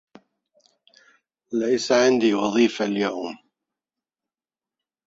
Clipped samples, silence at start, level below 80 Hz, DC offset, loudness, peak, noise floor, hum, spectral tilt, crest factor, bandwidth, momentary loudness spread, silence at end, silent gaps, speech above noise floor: under 0.1%; 1.5 s; -66 dBFS; under 0.1%; -21 LUFS; -6 dBFS; under -90 dBFS; none; -4 dB/octave; 20 dB; 8 kHz; 14 LU; 1.7 s; none; over 69 dB